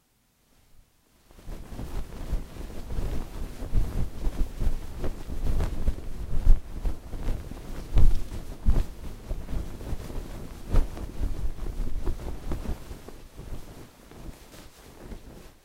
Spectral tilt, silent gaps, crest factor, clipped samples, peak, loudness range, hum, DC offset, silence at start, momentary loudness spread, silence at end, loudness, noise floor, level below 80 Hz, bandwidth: -6.5 dB/octave; none; 22 dB; under 0.1%; -4 dBFS; 8 LU; none; under 0.1%; 1.45 s; 16 LU; 0.15 s; -34 LUFS; -67 dBFS; -28 dBFS; 12 kHz